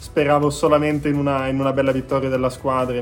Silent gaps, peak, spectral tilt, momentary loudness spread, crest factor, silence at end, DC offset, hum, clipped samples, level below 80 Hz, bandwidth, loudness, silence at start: none; -2 dBFS; -6.5 dB/octave; 4 LU; 16 dB; 0 s; under 0.1%; none; under 0.1%; -42 dBFS; 17 kHz; -19 LUFS; 0 s